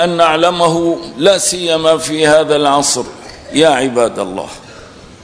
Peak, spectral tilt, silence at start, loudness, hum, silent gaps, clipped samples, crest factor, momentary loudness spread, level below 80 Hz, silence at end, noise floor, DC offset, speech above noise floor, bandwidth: 0 dBFS; -3 dB/octave; 0 s; -12 LUFS; none; none; 0.4%; 12 dB; 13 LU; -46 dBFS; 0.1 s; -36 dBFS; 0.1%; 23 dB; 11 kHz